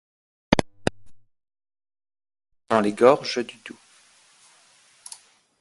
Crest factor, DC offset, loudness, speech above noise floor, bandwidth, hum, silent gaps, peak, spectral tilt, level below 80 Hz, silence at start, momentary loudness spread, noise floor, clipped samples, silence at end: 26 dB; under 0.1%; -22 LUFS; 37 dB; 11.5 kHz; none; none; 0 dBFS; -5 dB/octave; -52 dBFS; 0.5 s; 24 LU; -57 dBFS; under 0.1%; 1.9 s